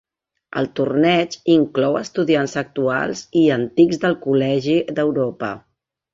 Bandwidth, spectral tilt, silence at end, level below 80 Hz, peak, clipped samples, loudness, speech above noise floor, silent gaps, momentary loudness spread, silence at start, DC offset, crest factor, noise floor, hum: 7.6 kHz; -6 dB/octave; 0.55 s; -58 dBFS; -2 dBFS; under 0.1%; -19 LUFS; 25 dB; none; 8 LU; 0.55 s; under 0.1%; 16 dB; -43 dBFS; none